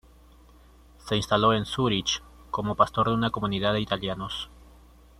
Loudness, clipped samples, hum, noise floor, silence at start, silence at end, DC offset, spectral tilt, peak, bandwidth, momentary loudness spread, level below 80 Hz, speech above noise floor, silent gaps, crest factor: -26 LUFS; under 0.1%; none; -53 dBFS; 1.05 s; 0.7 s; under 0.1%; -5 dB/octave; -6 dBFS; 14.5 kHz; 12 LU; -50 dBFS; 28 dB; none; 22 dB